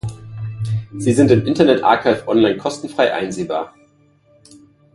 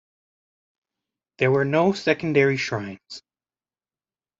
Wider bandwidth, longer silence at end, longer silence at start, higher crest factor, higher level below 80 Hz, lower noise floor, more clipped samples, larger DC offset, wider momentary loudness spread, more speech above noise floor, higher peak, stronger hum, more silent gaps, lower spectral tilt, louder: first, 11.5 kHz vs 7.8 kHz; about the same, 1.25 s vs 1.2 s; second, 0.05 s vs 1.4 s; about the same, 18 dB vs 22 dB; first, -48 dBFS vs -64 dBFS; second, -54 dBFS vs under -90 dBFS; neither; neither; second, 15 LU vs 20 LU; second, 39 dB vs over 68 dB; first, 0 dBFS vs -4 dBFS; neither; neither; about the same, -6.5 dB/octave vs -6 dB/octave; first, -17 LUFS vs -22 LUFS